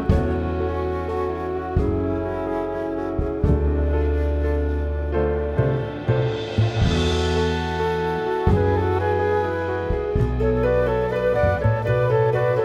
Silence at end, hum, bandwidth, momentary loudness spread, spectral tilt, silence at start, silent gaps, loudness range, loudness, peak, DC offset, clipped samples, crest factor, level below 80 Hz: 0 s; none; 9 kHz; 6 LU; -7.5 dB/octave; 0 s; none; 3 LU; -22 LUFS; -4 dBFS; under 0.1%; under 0.1%; 16 dB; -28 dBFS